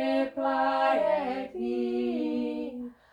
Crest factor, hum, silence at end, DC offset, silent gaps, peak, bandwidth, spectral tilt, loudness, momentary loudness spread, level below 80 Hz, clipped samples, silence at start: 14 dB; none; 0.2 s; under 0.1%; none; -14 dBFS; 10.5 kHz; -6 dB/octave; -29 LUFS; 9 LU; -66 dBFS; under 0.1%; 0 s